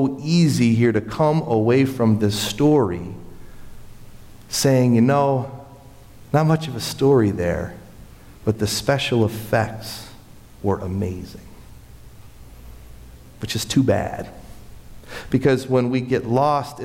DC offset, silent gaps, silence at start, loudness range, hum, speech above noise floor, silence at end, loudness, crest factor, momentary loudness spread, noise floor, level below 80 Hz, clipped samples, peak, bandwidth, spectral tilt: under 0.1%; none; 0 s; 8 LU; none; 24 dB; 0 s; -20 LUFS; 14 dB; 17 LU; -43 dBFS; -44 dBFS; under 0.1%; -6 dBFS; 16.5 kHz; -6 dB/octave